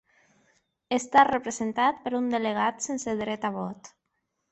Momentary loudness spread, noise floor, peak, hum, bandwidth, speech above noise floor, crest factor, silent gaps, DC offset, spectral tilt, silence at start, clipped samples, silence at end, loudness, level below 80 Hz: 11 LU; -79 dBFS; -6 dBFS; none; 8.4 kHz; 53 dB; 20 dB; none; under 0.1%; -3.5 dB/octave; 0.9 s; under 0.1%; 0.65 s; -26 LUFS; -64 dBFS